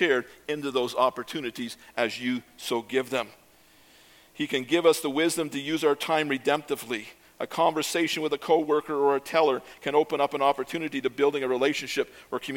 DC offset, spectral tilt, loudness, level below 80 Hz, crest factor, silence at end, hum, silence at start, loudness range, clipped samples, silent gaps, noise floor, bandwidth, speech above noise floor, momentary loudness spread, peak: under 0.1%; -3.5 dB/octave; -27 LUFS; -70 dBFS; 20 dB; 0 s; none; 0 s; 5 LU; under 0.1%; none; -57 dBFS; 17.5 kHz; 31 dB; 10 LU; -8 dBFS